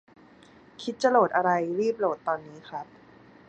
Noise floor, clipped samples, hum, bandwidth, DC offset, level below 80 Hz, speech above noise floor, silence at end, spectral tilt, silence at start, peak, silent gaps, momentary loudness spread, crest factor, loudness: -54 dBFS; under 0.1%; none; 9 kHz; under 0.1%; -72 dBFS; 28 dB; 0.65 s; -5.5 dB/octave; 0.8 s; -8 dBFS; none; 18 LU; 20 dB; -26 LUFS